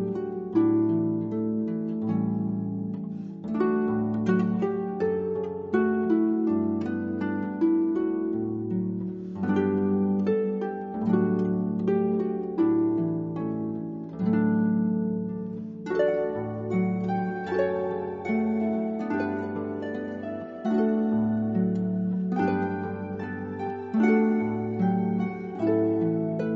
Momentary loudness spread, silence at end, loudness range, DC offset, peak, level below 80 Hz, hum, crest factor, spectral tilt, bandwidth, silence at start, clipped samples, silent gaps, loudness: 9 LU; 0 s; 2 LU; under 0.1%; -10 dBFS; -64 dBFS; none; 16 dB; -10 dB/octave; 5.6 kHz; 0 s; under 0.1%; none; -27 LUFS